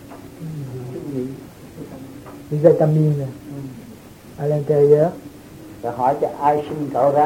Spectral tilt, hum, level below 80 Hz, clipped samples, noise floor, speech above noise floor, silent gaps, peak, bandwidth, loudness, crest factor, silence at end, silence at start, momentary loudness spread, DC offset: -9 dB/octave; none; -54 dBFS; under 0.1%; -40 dBFS; 24 dB; none; 0 dBFS; 16.5 kHz; -19 LUFS; 20 dB; 0 s; 0 s; 24 LU; under 0.1%